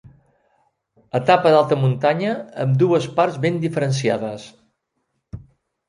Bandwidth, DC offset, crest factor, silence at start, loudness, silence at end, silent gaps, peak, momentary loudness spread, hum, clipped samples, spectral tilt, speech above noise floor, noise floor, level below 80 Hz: 11 kHz; under 0.1%; 18 dB; 1.15 s; -19 LUFS; 0.5 s; none; -2 dBFS; 21 LU; none; under 0.1%; -6.5 dB/octave; 55 dB; -73 dBFS; -56 dBFS